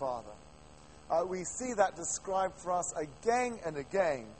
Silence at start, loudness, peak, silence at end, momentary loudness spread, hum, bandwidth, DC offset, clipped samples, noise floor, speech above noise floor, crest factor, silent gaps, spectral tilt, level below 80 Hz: 0 s; -34 LUFS; -14 dBFS; 0 s; 8 LU; none; 8.8 kHz; under 0.1%; under 0.1%; -56 dBFS; 22 dB; 20 dB; none; -3.5 dB/octave; -62 dBFS